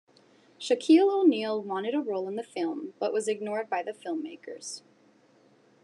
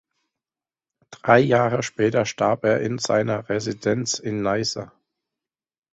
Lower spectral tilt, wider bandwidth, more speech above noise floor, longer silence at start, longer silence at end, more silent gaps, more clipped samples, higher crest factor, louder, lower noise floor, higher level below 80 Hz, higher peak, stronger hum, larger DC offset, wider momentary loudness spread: about the same, -4.5 dB/octave vs -5 dB/octave; first, 11 kHz vs 8.2 kHz; second, 34 dB vs over 69 dB; second, 0.6 s vs 1.1 s; about the same, 1.05 s vs 1.05 s; neither; neither; about the same, 18 dB vs 22 dB; second, -28 LUFS vs -22 LUFS; second, -62 dBFS vs under -90 dBFS; second, under -90 dBFS vs -58 dBFS; second, -10 dBFS vs -2 dBFS; neither; neither; first, 18 LU vs 9 LU